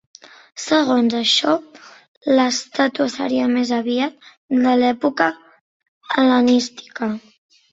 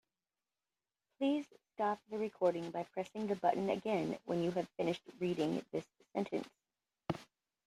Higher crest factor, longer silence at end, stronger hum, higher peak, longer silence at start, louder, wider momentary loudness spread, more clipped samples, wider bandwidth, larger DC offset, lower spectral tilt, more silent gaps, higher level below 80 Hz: about the same, 18 dB vs 22 dB; about the same, 0.55 s vs 0.45 s; neither; first, -2 dBFS vs -18 dBFS; second, 0.55 s vs 1.2 s; first, -18 LUFS vs -38 LUFS; about the same, 10 LU vs 9 LU; neither; second, 8 kHz vs 13.5 kHz; neither; second, -3 dB/octave vs -6.5 dB/octave; first, 2.08-2.21 s, 4.37-4.48 s, 5.61-5.80 s, 5.88-6.01 s vs none; first, -64 dBFS vs -78 dBFS